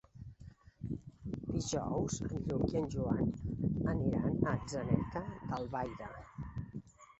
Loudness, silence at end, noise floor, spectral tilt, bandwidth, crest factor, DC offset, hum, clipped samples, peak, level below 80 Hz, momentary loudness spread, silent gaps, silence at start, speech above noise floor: -37 LUFS; 0.15 s; -56 dBFS; -7.5 dB/octave; 8 kHz; 22 dB; under 0.1%; none; under 0.1%; -14 dBFS; -52 dBFS; 15 LU; none; 0.15 s; 21 dB